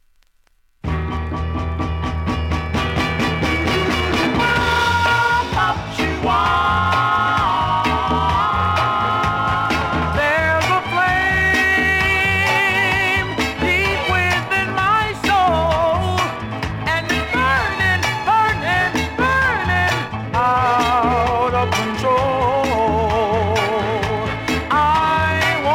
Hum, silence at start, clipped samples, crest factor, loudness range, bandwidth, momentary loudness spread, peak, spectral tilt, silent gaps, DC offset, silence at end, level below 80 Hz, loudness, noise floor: none; 0.85 s; under 0.1%; 12 dB; 3 LU; 16.5 kHz; 7 LU; -6 dBFS; -5 dB/octave; none; under 0.1%; 0 s; -32 dBFS; -17 LUFS; -57 dBFS